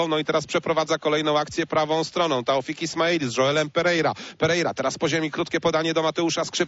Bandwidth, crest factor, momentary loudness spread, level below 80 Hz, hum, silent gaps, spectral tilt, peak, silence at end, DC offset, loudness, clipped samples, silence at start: 8 kHz; 14 dB; 3 LU; -60 dBFS; none; none; -4 dB/octave; -8 dBFS; 0 s; under 0.1%; -23 LUFS; under 0.1%; 0 s